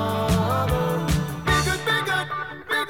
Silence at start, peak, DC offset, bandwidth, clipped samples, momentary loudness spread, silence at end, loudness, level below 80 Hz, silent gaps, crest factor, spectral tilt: 0 s; -8 dBFS; 0.3%; 19 kHz; under 0.1%; 4 LU; 0 s; -23 LUFS; -36 dBFS; none; 16 dB; -5 dB/octave